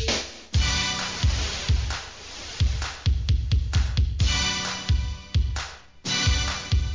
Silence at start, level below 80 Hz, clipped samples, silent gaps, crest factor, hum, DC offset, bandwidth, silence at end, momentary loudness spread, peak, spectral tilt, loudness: 0 s; -28 dBFS; under 0.1%; none; 14 dB; none; 0.2%; 7.6 kHz; 0 s; 10 LU; -10 dBFS; -3.5 dB/octave; -25 LUFS